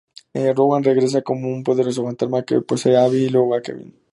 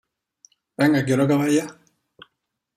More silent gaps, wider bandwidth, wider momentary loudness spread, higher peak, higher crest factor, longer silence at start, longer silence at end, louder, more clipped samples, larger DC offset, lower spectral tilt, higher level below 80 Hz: neither; second, 11 kHz vs 14.5 kHz; second, 9 LU vs 16 LU; about the same, -4 dBFS vs -6 dBFS; about the same, 16 dB vs 18 dB; second, 0.35 s vs 0.8 s; second, 0.2 s vs 1.05 s; about the same, -18 LUFS vs -20 LUFS; neither; neither; about the same, -6.5 dB/octave vs -6 dB/octave; about the same, -64 dBFS vs -64 dBFS